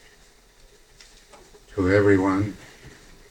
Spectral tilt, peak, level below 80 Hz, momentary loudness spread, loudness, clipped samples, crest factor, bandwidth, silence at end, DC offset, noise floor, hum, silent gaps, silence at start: -7.5 dB/octave; -6 dBFS; -50 dBFS; 23 LU; -22 LUFS; under 0.1%; 20 dB; 10.5 kHz; 0.4 s; under 0.1%; -54 dBFS; none; none; 1.75 s